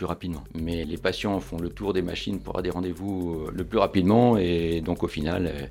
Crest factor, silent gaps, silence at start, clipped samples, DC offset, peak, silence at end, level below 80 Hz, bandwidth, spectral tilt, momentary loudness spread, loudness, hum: 20 dB; none; 0 s; under 0.1%; under 0.1%; -6 dBFS; 0 s; -44 dBFS; 16.5 kHz; -7 dB/octave; 11 LU; -26 LUFS; none